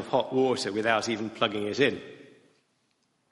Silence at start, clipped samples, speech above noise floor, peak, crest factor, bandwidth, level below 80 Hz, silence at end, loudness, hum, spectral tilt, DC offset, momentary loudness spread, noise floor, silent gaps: 0 s; under 0.1%; 45 dB; -8 dBFS; 20 dB; 11.5 kHz; -70 dBFS; 1.1 s; -27 LUFS; none; -4 dB/octave; under 0.1%; 6 LU; -72 dBFS; none